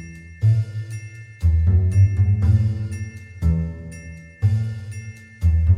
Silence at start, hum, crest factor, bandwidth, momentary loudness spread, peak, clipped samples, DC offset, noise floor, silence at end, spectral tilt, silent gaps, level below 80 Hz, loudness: 0 s; none; 14 dB; 9.6 kHz; 18 LU; -6 dBFS; under 0.1%; under 0.1%; -38 dBFS; 0 s; -8.5 dB/octave; none; -28 dBFS; -21 LUFS